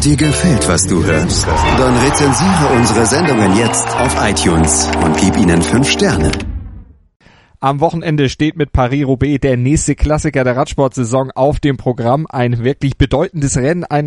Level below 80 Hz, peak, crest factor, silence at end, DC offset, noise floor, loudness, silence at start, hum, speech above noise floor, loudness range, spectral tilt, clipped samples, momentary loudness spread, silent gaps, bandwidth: -26 dBFS; 0 dBFS; 12 dB; 0 s; under 0.1%; -35 dBFS; -13 LUFS; 0 s; none; 22 dB; 4 LU; -5 dB/octave; under 0.1%; 5 LU; 7.16-7.20 s; 11.5 kHz